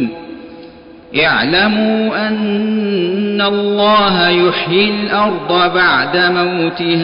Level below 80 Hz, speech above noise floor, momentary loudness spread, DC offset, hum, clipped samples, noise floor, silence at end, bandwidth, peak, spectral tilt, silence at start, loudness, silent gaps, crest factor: -48 dBFS; 23 dB; 6 LU; under 0.1%; none; under 0.1%; -36 dBFS; 0 s; 5.4 kHz; -2 dBFS; -10.5 dB/octave; 0 s; -13 LUFS; none; 12 dB